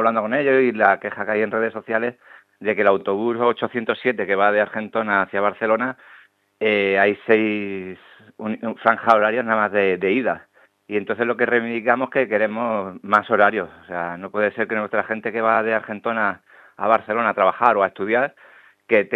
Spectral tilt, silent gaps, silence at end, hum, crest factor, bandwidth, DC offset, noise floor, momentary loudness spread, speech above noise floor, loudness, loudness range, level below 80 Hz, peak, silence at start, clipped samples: -7.5 dB/octave; none; 0 s; none; 20 dB; 6.6 kHz; under 0.1%; -42 dBFS; 10 LU; 22 dB; -20 LUFS; 2 LU; -72 dBFS; 0 dBFS; 0 s; under 0.1%